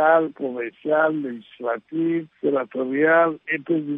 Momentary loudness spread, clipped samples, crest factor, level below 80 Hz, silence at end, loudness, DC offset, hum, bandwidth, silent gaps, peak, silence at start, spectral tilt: 11 LU; under 0.1%; 16 dB; -76 dBFS; 0 s; -22 LUFS; under 0.1%; none; 3.8 kHz; none; -6 dBFS; 0 s; -10 dB/octave